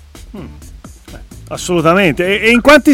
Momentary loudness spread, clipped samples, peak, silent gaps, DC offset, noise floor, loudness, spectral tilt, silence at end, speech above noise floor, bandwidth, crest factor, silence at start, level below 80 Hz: 25 LU; under 0.1%; 0 dBFS; none; under 0.1%; -33 dBFS; -10 LUFS; -4.5 dB/octave; 0 s; 23 dB; 17 kHz; 12 dB; 0.2 s; -34 dBFS